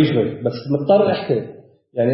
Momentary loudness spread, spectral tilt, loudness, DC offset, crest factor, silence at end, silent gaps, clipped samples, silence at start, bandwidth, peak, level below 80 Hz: 12 LU; -11.5 dB/octave; -19 LUFS; under 0.1%; 14 dB; 0 s; none; under 0.1%; 0 s; 5.8 kHz; -4 dBFS; -60 dBFS